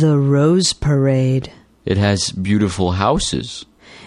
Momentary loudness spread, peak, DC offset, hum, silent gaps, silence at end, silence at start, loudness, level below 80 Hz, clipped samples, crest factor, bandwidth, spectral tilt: 13 LU; -2 dBFS; under 0.1%; none; none; 0 s; 0 s; -17 LUFS; -38 dBFS; under 0.1%; 14 dB; 11.5 kHz; -5.5 dB/octave